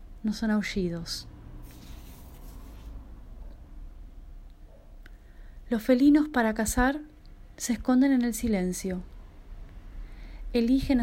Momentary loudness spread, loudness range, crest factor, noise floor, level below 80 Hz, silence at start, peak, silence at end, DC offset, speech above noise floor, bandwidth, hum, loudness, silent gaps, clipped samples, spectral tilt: 26 LU; 23 LU; 18 dB; -48 dBFS; -42 dBFS; 0 s; -10 dBFS; 0 s; under 0.1%; 23 dB; 16 kHz; none; -27 LUFS; none; under 0.1%; -5 dB/octave